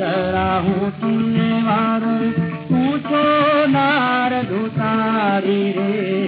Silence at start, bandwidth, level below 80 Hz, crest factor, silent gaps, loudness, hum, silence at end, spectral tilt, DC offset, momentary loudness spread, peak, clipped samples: 0 s; 5 kHz; -50 dBFS; 12 dB; none; -18 LUFS; none; 0 s; -10 dB/octave; under 0.1%; 5 LU; -6 dBFS; under 0.1%